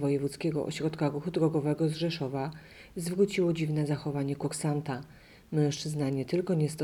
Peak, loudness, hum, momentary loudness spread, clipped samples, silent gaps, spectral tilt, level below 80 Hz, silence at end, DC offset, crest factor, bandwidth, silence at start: -14 dBFS; -31 LUFS; none; 9 LU; under 0.1%; none; -6.5 dB/octave; -62 dBFS; 0 s; under 0.1%; 16 dB; 14 kHz; 0 s